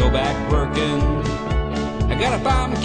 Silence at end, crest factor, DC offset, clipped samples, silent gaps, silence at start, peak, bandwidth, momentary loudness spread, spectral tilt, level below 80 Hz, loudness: 0 s; 14 dB; under 0.1%; under 0.1%; none; 0 s; -6 dBFS; 9.8 kHz; 4 LU; -6 dB/octave; -24 dBFS; -21 LUFS